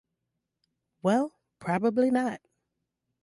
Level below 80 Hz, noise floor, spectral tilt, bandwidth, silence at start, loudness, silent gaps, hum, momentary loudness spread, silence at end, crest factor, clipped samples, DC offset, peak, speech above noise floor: -74 dBFS; -83 dBFS; -7 dB/octave; 11.5 kHz; 1.05 s; -28 LUFS; none; none; 12 LU; 0.85 s; 16 dB; under 0.1%; under 0.1%; -14 dBFS; 58 dB